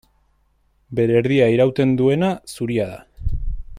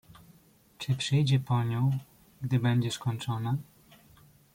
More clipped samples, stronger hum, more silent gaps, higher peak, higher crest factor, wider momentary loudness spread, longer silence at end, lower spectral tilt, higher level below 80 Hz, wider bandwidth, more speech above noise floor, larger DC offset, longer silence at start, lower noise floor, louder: neither; neither; neither; first, -4 dBFS vs -14 dBFS; about the same, 16 dB vs 16 dB; first, 13 LU vs 9 LU; second, 0 s vs 0.95 s; first, -7.5 dB/octave vs -6 dB/octave; first, -32 dBFS vs -62 dBFS; second, 14.5 kHz vs 16 kHz; first, 44 dB vs 32 dB; neither; about the same, 0.9 s vs 0.8 s; about the same, -62 dBFS vs -60 dBFS; first, -19 LUFS vs -30 LUFS